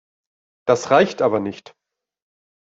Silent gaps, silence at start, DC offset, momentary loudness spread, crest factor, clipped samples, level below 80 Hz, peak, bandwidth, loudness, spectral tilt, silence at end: none; 0.65 s; under 0.1%; 14 LU; 20 dB; under 0.1%; -64 dBFS; -2 dBFS; 8 kHz; -19 LUFS; -5 dB/octave; 1.05 s